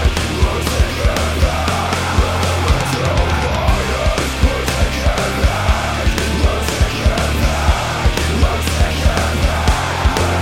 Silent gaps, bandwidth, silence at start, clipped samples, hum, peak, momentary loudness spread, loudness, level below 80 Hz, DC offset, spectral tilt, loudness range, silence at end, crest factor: none; 16.5 kHz; 0 s; under 0.1%; none; 0 dBFS; 1 LU; -16 LUFS; -18 dBFS; under 0.1%; -4.5 dB/octave; 0 LU; 0 s; 14 dB